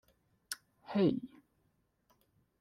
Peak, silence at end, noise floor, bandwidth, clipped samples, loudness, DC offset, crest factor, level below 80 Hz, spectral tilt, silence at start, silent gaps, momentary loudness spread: -18 dBFS; 1.35 s; -77 dBFS; 15 kHz; under 0.1%; -36 LUFS; under 0.1%; 22 dB; -74 dBFS; -6 dB/octave; 0.5 s; none; 14 LU